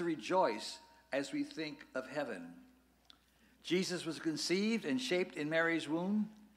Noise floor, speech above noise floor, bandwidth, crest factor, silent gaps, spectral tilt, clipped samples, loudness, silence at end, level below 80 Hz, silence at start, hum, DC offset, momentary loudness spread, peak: -69 dBFS; 32 dB; 15.5 kHz; 18 dB; none; -4.5 dB/octave; under 0.1%; -37 LUFS; 0.1 s; -78 dBFS; 0 s; none; under 0.1%; 11 LU; -20 dBFS